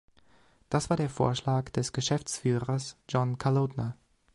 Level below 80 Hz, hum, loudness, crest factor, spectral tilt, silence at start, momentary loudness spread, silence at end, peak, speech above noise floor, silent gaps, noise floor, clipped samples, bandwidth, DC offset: -56 dBFS; none; -30 LUFS; 18 dB; -5.5 dB/octave; 0.7 s; 6 LU; 0.4 s; -12 dBFS; 35 dB; none; -64 dBFS; under 0.1%; 11.5 kHz; under 0.1%